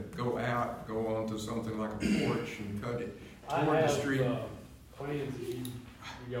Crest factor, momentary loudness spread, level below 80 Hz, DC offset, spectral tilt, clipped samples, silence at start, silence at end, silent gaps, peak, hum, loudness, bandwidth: 18 dB; 15 LU; -56 dBFS; under 0.1%; -6 dB/octave; under 0.1%; 0 s; 0 s; none; -16 dBFS; none; -34 LUFS; 16 kHz